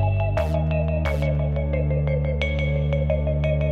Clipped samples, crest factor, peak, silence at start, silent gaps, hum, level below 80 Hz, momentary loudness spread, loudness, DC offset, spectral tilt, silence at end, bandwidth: under 0.1%; 14 dB; -6 dBFS; 0 s; none; none; -28 dBFS; 1 LU; -23 LUFS; under 0.1%; -8.5 dB/octave; 0 s; 6.8 kHz